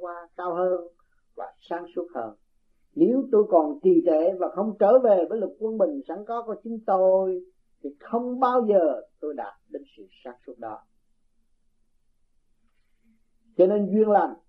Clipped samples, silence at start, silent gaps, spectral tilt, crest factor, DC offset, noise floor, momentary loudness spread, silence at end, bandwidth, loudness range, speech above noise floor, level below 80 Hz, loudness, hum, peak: under 0.1%; 0 s; none; -10.5 dB/octave; 18 dB; under 0.1%; -65 dBFS; 21 LU; 0.15 s; 5.4 kHz; 12 LU; 42 dB; -68 dBFS; -23 LUFS; none; -6 dBFS